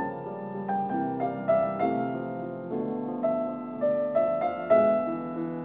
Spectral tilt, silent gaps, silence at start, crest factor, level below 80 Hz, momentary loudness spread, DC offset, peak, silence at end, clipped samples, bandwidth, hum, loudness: -11 dB/octave; none; 0 s; 16 dB; -66 dBFS; 11 LU; under 0.1%; -10 dBFS; 0 s; under 0.1%; 4 kHz; none; -28 LUFS